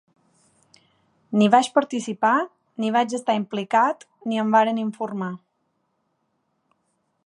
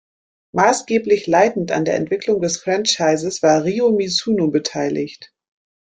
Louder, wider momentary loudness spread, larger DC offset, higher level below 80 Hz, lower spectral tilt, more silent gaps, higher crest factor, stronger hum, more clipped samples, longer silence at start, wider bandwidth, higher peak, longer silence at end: second, -22 LUFS vs -18 LUFS; first, 13 LU vs 6 LU; neither; second, -78 dBFS vs -58 dBFS; about the same, -5 dB/octave vs -4 dB/octave; neither; first, 22 dB vs 16 dB; neither; neither; first, 1.3 s vs 0.55 s; first, 11 kHz vs 9.4 kHz; about the same, -2 dBFS vs -2 dBFS; first, 1.9 s vs 0.7 s